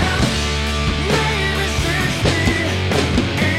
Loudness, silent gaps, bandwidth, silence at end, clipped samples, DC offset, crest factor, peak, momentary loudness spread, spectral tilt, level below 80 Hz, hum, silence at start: -18 LUFS; none; 16 kHz; 0 s; under 0.1%; 0.6%; 14 dB; -4 dBFS; 2 LU; -4.5 dB/octave; -26 dBFS; none; 0 s